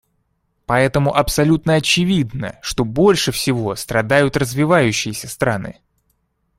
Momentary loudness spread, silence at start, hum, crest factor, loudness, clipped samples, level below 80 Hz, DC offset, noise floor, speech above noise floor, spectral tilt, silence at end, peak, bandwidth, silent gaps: 10 LU; 0.7 s; none; 18 dB; -17 LUFS; under 0.1%; -40 dBFS; under 0.1%; -67 dBFS; 50 dB; -5 dB/octave; 0.85 s; 0 dBFS; 16 kHz; none